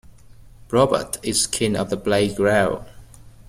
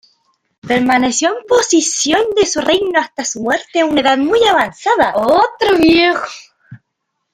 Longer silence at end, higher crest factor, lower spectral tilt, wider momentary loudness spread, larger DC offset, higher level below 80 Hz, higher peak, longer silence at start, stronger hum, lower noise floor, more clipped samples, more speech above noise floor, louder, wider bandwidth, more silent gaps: second, 0.2 s vs 0.6 s; about the same, 18 dB vs 14 dB; first, -4 dB/octave vs -2.5 dB/octave; about the same, 5 LU vs 6 LU; neither; about the same, -46 dBFS vs -46 dBFS; second, -4 dBFS vs 0 dBFS; about the same, 0.7 s vs 0.65 s; neither; second, -45 dBFS vs -73 dBFS; neither; second, 25 dB vs 60 dB; second, -20 LUFS vs -13 LUFS; about the same, 16 kHz vs 15.5 kHz; neither